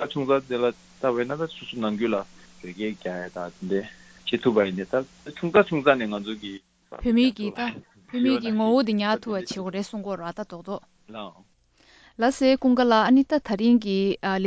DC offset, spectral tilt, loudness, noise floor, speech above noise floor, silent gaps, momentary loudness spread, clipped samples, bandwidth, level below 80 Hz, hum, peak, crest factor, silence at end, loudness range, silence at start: under 0.1%; -6 dB/octave; -24 LUFS; -58 dBFS; 34 dB; none; 17 LU; under 0.1%; 8 kHz; -56 dBFS; none; -2 dBFS; 22 dB; 0 s; 7 LU; 0 s